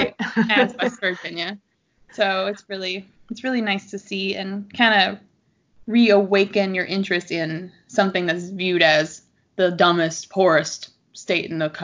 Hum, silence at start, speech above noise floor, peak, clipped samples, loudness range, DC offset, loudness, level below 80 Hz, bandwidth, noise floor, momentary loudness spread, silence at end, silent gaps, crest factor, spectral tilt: none; 0 s; 41 dB; -2 dBFS; under 0.1%; 6 LU; under 0.1%; -21 LUFS; -64 dBFS; 7.6 kHz; -62 dBFS; 14 LU; 0 s; none; 18 dB; -4.5 dB/octave